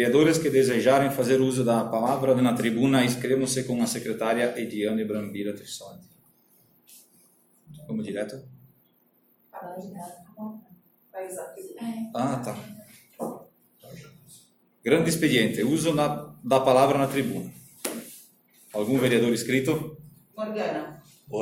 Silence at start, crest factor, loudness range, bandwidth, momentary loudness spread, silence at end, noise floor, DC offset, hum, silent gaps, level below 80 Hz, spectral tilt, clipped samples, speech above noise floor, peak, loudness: 0 s; 20 dB; 16 LU; 17 kHz; 19 LU; 0 s; -65 dBFS; under 0.1%; none; none; -64 dBFS; -5 dB/octave; under 0.1%; 40 dB; -6 dBFS; -25 LUFS